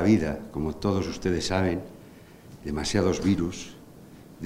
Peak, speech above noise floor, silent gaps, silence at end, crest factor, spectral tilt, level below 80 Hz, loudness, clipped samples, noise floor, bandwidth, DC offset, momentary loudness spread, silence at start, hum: -8 dBFS; 23 dB; none; 0 s; 18 dB; -5.5 dB/octave; -46 dBFS; -27 LUFS; under 0.1%; -48 dBFS; 16 kHz; under 0.1%; 20 LU; 0 s; none